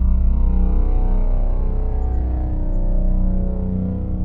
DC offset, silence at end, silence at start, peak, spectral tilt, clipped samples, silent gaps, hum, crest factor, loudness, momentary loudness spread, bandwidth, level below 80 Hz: 0.4%; 0 s; 0 s; -6 dBFS; -12.5 dB/octave; under 0.1%; none; none; 10 dB; -22 LUFS; 4 LU; 1.7 kHz; -16 dBFS